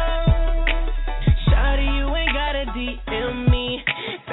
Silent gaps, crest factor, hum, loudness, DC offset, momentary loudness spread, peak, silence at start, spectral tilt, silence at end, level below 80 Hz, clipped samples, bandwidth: none; 14 dB; none; -22 LUFS; under 0.1%; 7 LU; -6 dBFS; 0 s; -9.5 dB/octave; 0 s; -22 dBFS; under 0.1%; 4.1 kHz